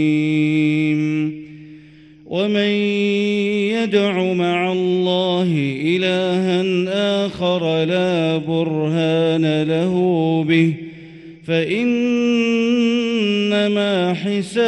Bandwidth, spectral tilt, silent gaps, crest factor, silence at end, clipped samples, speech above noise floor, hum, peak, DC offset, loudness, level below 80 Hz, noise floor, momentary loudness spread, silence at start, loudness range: 11 kHz; -6.5 dB/octave; none; 14 dB; 0 s; under 0.1%; 26 dB; none; -4 dBFS; under 0.1%; -18 LUFS; -60 dBFS; -44 dBFS; 4 LU; 0 s; 2 LU